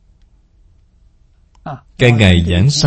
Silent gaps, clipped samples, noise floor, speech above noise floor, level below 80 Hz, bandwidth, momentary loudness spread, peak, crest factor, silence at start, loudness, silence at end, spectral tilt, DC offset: none; 0.3%; -50 dBFS; 39 dB; -32 dBFS; 11 kHz; 21 LU; 0 dBFS; 16 dB; 1.65 s; -11 LUFS; 0 s; -5.5 dB/octave; under 0.1%